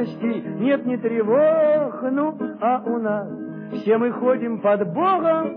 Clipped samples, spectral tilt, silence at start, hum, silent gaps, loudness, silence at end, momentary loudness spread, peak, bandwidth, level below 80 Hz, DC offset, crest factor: under 0.1%; -10 dB/octave; 0 s; none; none; -21 LUFS; 0 s; 8 LU; -8 dBFS; 5.2 kHz; -78 dBFS; under 0.1%; 14 dB